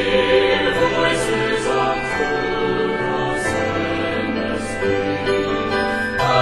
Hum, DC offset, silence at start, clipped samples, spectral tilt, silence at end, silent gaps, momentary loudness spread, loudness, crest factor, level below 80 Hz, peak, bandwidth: none; under 0.1%; 0 s; under 0.1%; -4.5 dB/octave; 0 s; none; 6 LU; -19 LUFS; 16 dB; -40 dBFS; -2 dBFS; 12.5 kHz